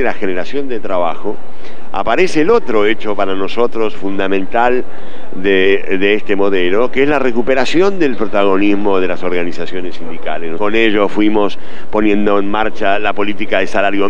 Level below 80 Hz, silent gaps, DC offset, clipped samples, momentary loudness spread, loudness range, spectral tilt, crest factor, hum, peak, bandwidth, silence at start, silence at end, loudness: -40 dBFS; none; 30%; under 0.1%; 11 LU; 3 LU; -5.5 dB/octave; 16 dB; none; 0 dBFS; 9.4 kHz; 0 s; 0 s; -15 LUFS